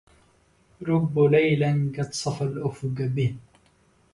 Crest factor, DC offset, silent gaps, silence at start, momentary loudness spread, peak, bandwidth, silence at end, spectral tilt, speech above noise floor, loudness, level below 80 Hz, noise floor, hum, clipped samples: 18 dB; under 0.1%; none; 0.8 s; 10 LU; -8 dBFS; 11.5 kHz; 0.75 s; -6.5 dB/octave; 38 dB; -24 LUFS; -58 dBFS; -61 dBFS; none; under 0.1%